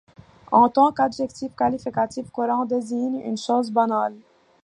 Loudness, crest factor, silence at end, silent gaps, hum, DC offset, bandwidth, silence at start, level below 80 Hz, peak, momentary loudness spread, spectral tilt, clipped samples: -22 LUFS; 20 dB; 0.45 s; none; none; under 0.1%; 11 kHz; 0.5 s; -62 dBFS; -4 dBFS; 10 LU; -5.5 dB/octave; under 0.1%